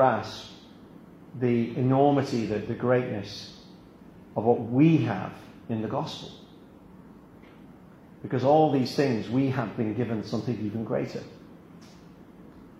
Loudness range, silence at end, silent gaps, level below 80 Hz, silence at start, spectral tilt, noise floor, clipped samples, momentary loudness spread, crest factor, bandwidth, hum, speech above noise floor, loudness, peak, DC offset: 6 LU; 0.1 s; none; -62 dBFS; 0 s; -7.5 dB/octave; -50 dBFS; under 0.1%; 22 LU; 20 dB; 13.5 kHz; none; 25 dB; -26 LUFS; -8 dBFS; under 0.1%